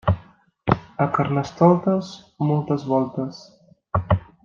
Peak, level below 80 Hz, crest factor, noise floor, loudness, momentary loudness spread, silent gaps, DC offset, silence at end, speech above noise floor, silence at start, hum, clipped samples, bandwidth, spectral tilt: -2 dBFS; -46 dBFS; 20 dB; -50 dBFS; -22 LUFS; 12 LU; none; under 0.1%; 0.25 s; 29 dB; 0.05 s; none; under 0.1%; 7.2 kHz; -8.5 dB/octave